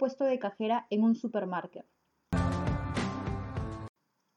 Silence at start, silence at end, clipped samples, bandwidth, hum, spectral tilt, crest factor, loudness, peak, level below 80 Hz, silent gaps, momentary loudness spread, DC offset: 0 s; 0.5 s; under 0.1%; 11 kHz; none; -7.5 dB/octave; 16 dB; -32 LUFS; -18 dBFS; -46 dBFS; none; 14 LU; under 0.1%